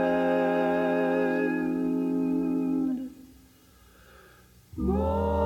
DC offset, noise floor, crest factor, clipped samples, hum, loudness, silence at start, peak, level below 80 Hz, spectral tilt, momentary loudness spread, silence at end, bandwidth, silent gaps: under 0.1%; -56 dBFS; 14 dB; under 0.1%; none; -27 LUFS; 0 s; -14 dBFS; -44 dBFS; -8 dB/octave; 7 LU; 0 s; 15.5 kHz; none